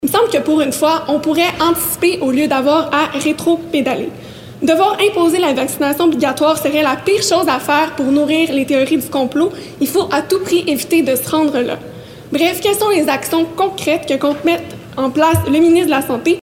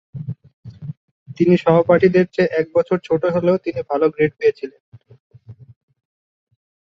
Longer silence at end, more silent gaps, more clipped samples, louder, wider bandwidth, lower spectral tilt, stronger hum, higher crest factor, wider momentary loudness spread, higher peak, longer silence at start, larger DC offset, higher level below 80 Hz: second, 0 s vs 1.35 s; second, none vs 0.53-0.63 s, 0.97-1.26 s, 4.80-4.92 s, 5.20-5.30 s; neither; first, -14 LUFS vs -17 LUFS; first, 17 kHz vs 7.2 kHz; second, -4 dB/octave vs -8.5 dB/octave; neither; second, 12 dB vs 20 dB; second, 6 LU vs 20 LU; about the same, -2 dBFS vs 0 dBFS; second, 0 s vs 0.15 s; neither; first, -50 dBFS vs -56 dBFS